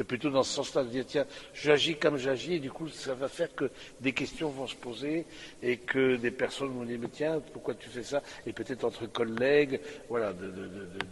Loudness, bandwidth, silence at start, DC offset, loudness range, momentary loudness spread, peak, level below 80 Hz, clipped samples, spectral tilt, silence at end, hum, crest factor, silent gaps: -32 LUFS; 11.5 kHz; 0 s; under 0.1%; 4 LU; 12 LU; -8 dBFS; -62 dBFS; under 0.1%; -4.5 dB/octave; 0 s; none; 24 dB; none